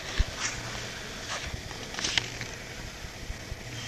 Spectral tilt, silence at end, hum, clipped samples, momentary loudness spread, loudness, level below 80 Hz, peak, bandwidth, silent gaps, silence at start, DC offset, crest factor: -2 dB/octave; 0 s; none; under 0.1%; 12 LU; -34 LUFS; -40 dBFS; -6 dBFS; 14 kHz; none; 0 s; under 0.1%; 28 dB